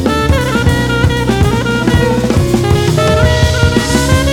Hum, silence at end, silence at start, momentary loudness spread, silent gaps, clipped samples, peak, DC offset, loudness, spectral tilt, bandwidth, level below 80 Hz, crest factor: none; 0 s; 0 s; 2 LU; none; under 0.1%; 0 dBFS; under 0.1%; -11 LUFS; -5.5 dB/octave; 18 kHz; -20 dBFS; 10 dB